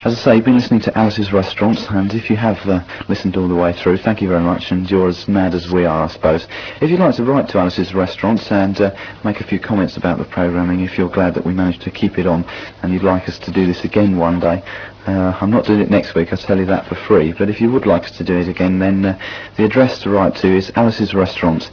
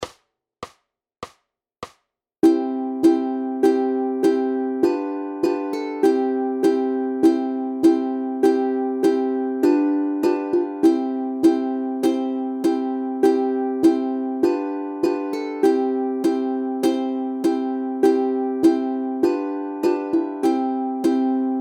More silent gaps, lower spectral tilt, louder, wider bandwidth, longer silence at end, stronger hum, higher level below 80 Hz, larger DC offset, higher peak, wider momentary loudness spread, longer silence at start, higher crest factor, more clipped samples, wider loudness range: neither; first, -8 dB/octave vs -5.5 dB/octave; first, -16 LUFS vs -21 LUFS; second, 5.4 kHz vs 15 kHz; about the same, 0 s vs 0 s; neither; first, -42 dBFS vs -66 dBFS; neither; first, 0 dBFS vs -4 dBFS; about the same, 6 LU vs 7 LU; about the same, 0 s vs 0 s; about the same, 16 dB vs 16 dB; neither; about the same, 2 LU vs 2 LU